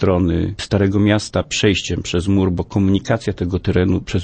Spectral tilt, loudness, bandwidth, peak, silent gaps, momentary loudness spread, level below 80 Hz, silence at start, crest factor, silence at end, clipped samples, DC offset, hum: -6 dB/octave; -18 LUFS; 8.8 kHz; -2 dBFS; none; 5 LU; -36 dBFS; 0 s; 14 dB; 0 s; under 0.1%; under 0.1%; none